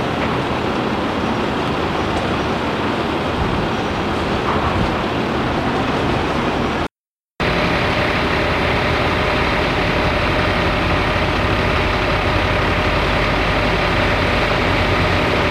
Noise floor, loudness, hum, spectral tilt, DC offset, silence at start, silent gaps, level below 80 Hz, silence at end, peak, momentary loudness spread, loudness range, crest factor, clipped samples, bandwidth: under -90 dBFS; -18 LUFS; none; -6 dB/octave; under 0.1%; 0 s; 6.99-7.05 s, 7.11-7.24 s; -30 dBFS; 0 s; -2 dBFS; 3 LU; 3 LU; 14 dB; under 0.1%; 15.5 kHz